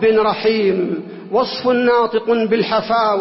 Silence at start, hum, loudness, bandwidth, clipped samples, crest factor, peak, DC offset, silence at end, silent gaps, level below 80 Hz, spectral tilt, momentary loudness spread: 0 s; none; -17 LUFS; 5.8 kHz; under 0.1%; 10 dB; -6 dBFS; under 0.1%; 0 s; none; -54 dBFS; -8.5 dB/octave; 6 LU